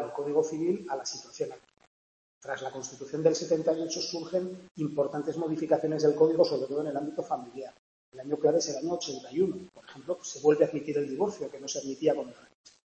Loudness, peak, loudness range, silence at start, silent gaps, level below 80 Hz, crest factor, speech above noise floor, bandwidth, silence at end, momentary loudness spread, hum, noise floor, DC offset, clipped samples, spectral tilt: -30 LUFS; -10 dBFS; 4 LU; 0 s; 1.87-2.41 s, 4.71-4.75 s, 7.79-8.12 s; -74 dBFS; 22 dB; over 60 dB; 8.4 kHz; 0.6 s; 13 LU; none; under -90 dBFS; under 0.1%; under 0.1%; -5 dB/octave